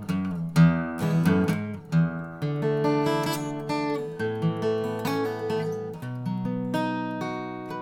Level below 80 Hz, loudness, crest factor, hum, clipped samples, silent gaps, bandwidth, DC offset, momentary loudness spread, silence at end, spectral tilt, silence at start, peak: -58 dBFS; -27 LUFS; 18 dB; none; under 0.1%; none; 17 kHz; under 0.1%; 10 LU; 0 s; -7 dB/octave; 0 s; -8 dBFS